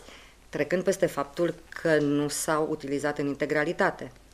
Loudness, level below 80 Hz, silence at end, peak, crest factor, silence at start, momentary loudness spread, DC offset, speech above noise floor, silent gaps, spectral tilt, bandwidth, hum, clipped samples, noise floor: -27 LUFS; -58 dBFS; 0.25 s; -10 dBFS; 18 dB; 0.05 s; 6 LU; under 0.1%; 23 dB; none; -4.5 dB/octave; 15.5 kHz; none; under 0.1%; -50 dBFS